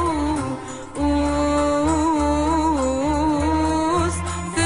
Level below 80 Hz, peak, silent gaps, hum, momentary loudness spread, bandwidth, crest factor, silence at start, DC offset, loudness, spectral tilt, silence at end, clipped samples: -32 dBFS; -8 dBFS; none; none; 6 LU; 11 kHz; 12 dB; 0 s; 0.4%; -21 LUFS; -5.5 dB/octave; 0 s; under 0.1%